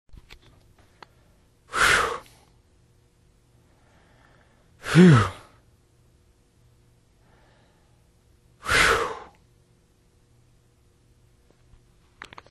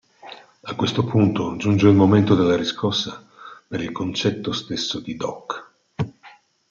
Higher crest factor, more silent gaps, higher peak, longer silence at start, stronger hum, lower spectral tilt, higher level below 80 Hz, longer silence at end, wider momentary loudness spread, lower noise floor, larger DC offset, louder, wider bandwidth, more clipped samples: first, 26 dB vs 18 dB; neither; about the same, -2 dBFS vs -2 dBFS; first, 1.75 s vs 0.25 s; neither; second, -5 dB/octave vs -6.5 dB/octave; first, -50 dBFS vs -58 dBFS; first, 3.25 s vs 0.4 s; first, 29 LU vs 19 LU; first, -61 dBFS vs -50 dBFS; neither; about the same, -20 LUFS vs -21 LUFS; first, 13.5 kHz vs 7.4 kHz; neither